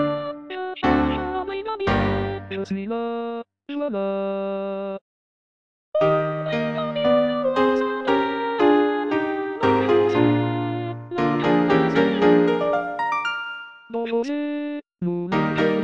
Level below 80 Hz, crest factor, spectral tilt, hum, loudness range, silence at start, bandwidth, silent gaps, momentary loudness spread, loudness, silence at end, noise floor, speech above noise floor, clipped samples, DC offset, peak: -46 dBFS; 18 dB; -7.5 dB/octave; none; 6 LU; 0 s; 7.6 kHz; 5.01-5.92 s; 11 LU; -22 LUFS; 0 s; under -90 dBFS; over 64 dB; under 0.1%; under 0.1%; -6 dBFS